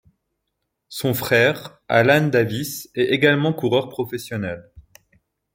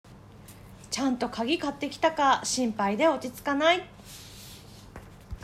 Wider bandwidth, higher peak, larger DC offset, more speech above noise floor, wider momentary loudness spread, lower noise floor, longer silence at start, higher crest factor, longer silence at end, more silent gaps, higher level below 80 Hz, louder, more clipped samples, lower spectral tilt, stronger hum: about the same, 16.5 kHz vs 16 kHz; first, -2 dBFS vs -10 dBFS; neither; first, 57 dB vs 22 dB; second, 12 LU vs 23 LU; first, -77 dBFS vs -49 dBFS; first, 0.9 s vs 0.1 s; about the same, 20 dB vs 18 dB; first, 0.75 s vs 0 s; neither; about the same, -58 dBFS vs -54 dBFS; first, -20 LUFS vs -27 LUFS; neither; first, -5.5 dB/octave vs -3 dB/octave; neither